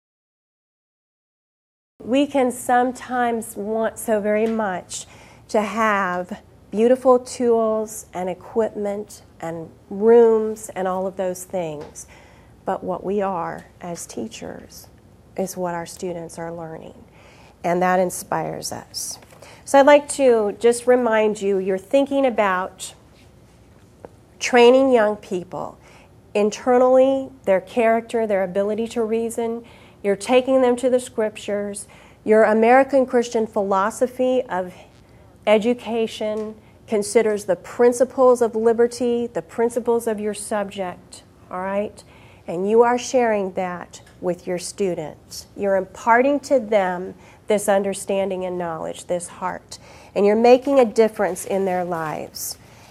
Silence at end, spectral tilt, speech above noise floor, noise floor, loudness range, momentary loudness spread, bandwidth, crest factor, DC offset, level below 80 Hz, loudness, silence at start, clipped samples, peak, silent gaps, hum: 0.35 s; -4.5 dB/octave; 30 dB; -49 dBFS; 7 LU; 17 LU; 15 kHz; 20 dB; under 0.1%; -56 dBFS; -20 LUFS; 2 s; under 0.1%; 0 dBFS; none; none